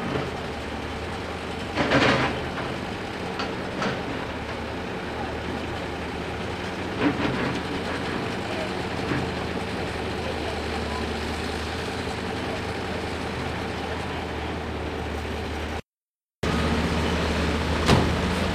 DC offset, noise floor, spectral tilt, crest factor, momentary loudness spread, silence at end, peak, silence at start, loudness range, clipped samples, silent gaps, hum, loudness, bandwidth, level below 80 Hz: under 0.1%; under -90 dBFS; -5.5 dB/octave; 22 dB; 8 LU; 0 s; -6 dBFS; 0 s; 4 LU; under 0.1%; 15.85-15.93 s, 16.02-16.14 s, 16.35-16.42 s; none; -27 LUFS; 15.5 kHz; -40 dBFS